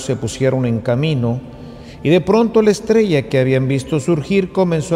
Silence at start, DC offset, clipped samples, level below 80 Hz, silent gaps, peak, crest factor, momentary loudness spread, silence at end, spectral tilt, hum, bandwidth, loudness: 0 s; under 0.1%; under 0.1%; -44 dBFS; none; -2 dBFS; 14 dB; 9 LU; 0 s; -6.5 dB/octave; none; 13 kHz; -16 LUFS